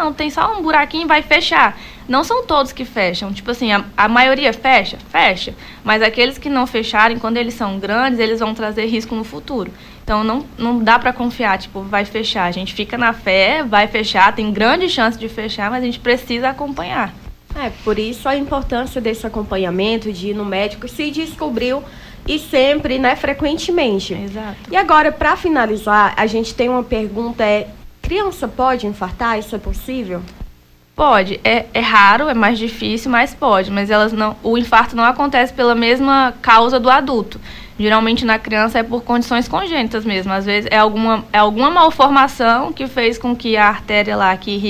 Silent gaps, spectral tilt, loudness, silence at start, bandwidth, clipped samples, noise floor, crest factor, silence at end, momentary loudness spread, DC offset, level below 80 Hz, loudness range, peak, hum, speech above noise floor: none; -4.5 dB/octave; -15 LUFS; 0 s; 16 kHz; under 0.1%; -44 dBFS; 16 dB; 0 s; 11 LU; under 0.1%; -36 dBFS; 7 LU; 0 dBFS; none; 29 dB